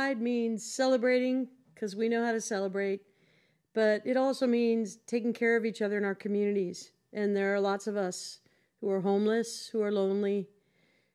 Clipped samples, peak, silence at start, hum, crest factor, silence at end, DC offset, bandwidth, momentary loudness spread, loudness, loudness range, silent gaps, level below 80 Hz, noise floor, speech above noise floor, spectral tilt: under 0.1%; -16 dBFS; 0 s; none; 16 dB; 0.7 s; under 0.1%; 13.5 kHz; 10 LU; -30 LUFS; 2 LU; none; -88 dBFS; -70 dBFS; 40 dB; -5 dB/octave